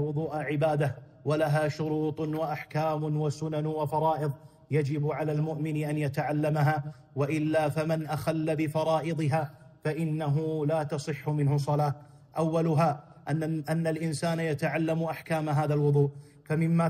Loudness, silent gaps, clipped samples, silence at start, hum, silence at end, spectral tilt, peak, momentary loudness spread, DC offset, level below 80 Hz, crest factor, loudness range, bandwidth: -29 LUFS; none; under 0.1%; 0 s; none; 0 s; -7.5 dB/octave; -12 dBFS; 6 LU; under 0.1%; -64 dBFS; 16 dB; 1 LU; 14.5 kHz